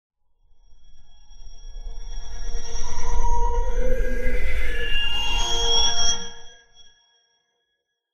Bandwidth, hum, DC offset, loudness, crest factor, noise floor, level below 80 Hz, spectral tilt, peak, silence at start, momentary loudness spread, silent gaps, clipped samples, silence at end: 7 kHz; none; under 0.1%; -25 LUFS; 14 dB; -77 dBFS; -26 dBFS; -2 dB/octave; -6 dBFS; 0.7 s; 21 LU; none; under 0.1%; 1.3 s